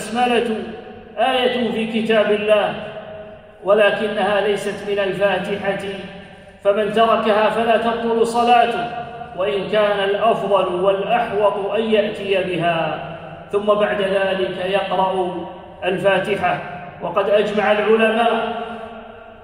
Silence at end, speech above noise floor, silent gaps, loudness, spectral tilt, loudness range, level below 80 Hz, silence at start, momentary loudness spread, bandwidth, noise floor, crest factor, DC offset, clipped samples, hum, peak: 0 s; 21 dB; none; -18 LUFS; -5 dB/octave; 2 LU; -54 dBFS; 0 s; 16 LU; 13 kHz; -39 dBFS; 16 dB; under 0.1%; under 0.1%; none; -2 dBFS